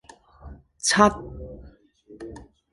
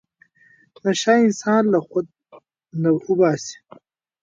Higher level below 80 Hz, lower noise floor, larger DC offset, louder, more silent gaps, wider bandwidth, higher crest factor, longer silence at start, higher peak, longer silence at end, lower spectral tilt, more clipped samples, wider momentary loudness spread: first, -46 dBFS vs -70 dBFS; second, -51 dBFS vs -56 dBFS; neither; about the same, -20 LUFS vs -19 LUFS; neither; first, 11.5 kHz vs 9 kHz; first, 24 dB vs 18 dB; second, 0.45 s vs 0.85 s; about the same, -2 dBFS vs -4 dBFS; second, 0.35 s vs 0.7 s; second, -3 dB/octave vs -5.5 dB/octave; neither; first, 24 LU vs 13 LU